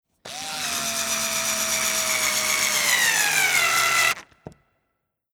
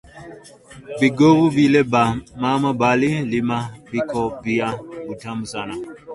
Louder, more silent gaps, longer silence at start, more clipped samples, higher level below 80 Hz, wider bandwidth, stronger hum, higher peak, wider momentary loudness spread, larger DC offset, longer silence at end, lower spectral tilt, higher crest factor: about the same, -20 LUFS vs -19 LUFS; neither; about the same, 0.25 s vs 0.15 s; neither; second, -60 dBFS vs -52 dBFS; first, over 20 kHz vs 11.5 kHz; neither; about the same, -4 dBFS vs -2 dBFS; second, 10 LU vs 17 LU; neither; first, 0.85 s vs 0 s; second, 1 dB/octave vs -6.5 dB/octave; about the same, 20 dB vs 18 dB